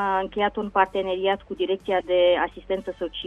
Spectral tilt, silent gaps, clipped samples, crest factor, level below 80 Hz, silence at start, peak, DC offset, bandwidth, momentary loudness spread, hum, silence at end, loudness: -6 dB/octave; none; under 0.1%; 20 dB; -52 dBFS; 0 s; -4 dBFS; under 0.1%; 6 kHz; 9 LU; none; 0 s; -24 LUFS